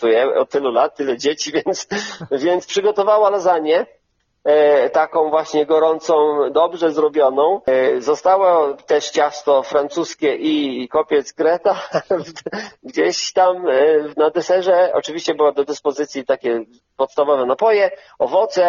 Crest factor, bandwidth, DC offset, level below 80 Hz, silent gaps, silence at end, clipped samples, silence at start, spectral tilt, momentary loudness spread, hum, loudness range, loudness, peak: 14 dB; 7.4 kHz; under 0.1%; -64 dBFS; none; 0 s; under 0.1%; 0 s; -2 dB/octave; 8 LU; none; 3 LU; -17 LUFS; -2 dBFS